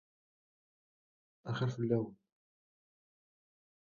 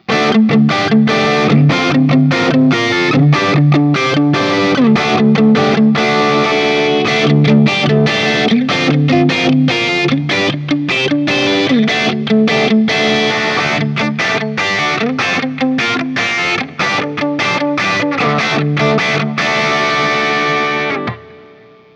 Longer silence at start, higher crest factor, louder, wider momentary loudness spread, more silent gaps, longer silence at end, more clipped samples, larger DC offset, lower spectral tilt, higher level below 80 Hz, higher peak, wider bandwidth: first, 1.45 s vs 0.1 s; first, 24 dB vs 12 dB; second, -37 LUFS vs -12 LUFS; first, 12 LU vs 4 LU; neither; first, 1.75 s vs 0.55 s; neither; neither; first, -7 dB/octave vs -5.5 dB/octave; second, -76 dBFS vs -50 dBFS; second, -18 dBFS vs 0 dBFS; second, 7 kHz vs 8.6 kHz